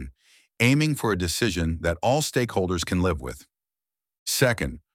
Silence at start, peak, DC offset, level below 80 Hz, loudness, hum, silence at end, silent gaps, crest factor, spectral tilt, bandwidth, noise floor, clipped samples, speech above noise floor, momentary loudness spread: 0 s; -6 dBFS; under 0.1%; -42 dBFS; -24 LUFS; none; 0.15 s; 4.19-4.26 s; 20 dB; -4.5 dB/octave; 17 kHz; under -90 dBFS; under 0.1%; over 66 dB; 12 LU